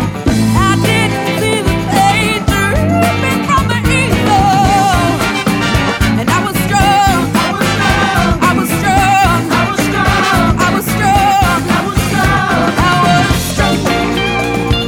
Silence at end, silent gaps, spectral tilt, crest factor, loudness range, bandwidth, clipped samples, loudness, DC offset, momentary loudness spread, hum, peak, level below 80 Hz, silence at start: 0 s; none; -5 dB/octave; 12 dB; 1 LU; 19 kHz; under 0.1%; -11 LUFS; under 0.1%; 4 LU; none; 0 dBFS; -24 dBFS; 0 s